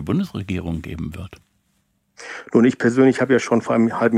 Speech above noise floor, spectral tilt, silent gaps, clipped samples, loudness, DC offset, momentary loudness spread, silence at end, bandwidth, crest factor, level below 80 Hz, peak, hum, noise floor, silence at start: 48 dB; -7 dB/octave; none; under 0.1%; -19 LUFS; under 0.1%; 19 LU; 0 s; 11 kHz; 16 dB; -50 dBFS; -2 dBFS; none; -67 dBFS; 0 s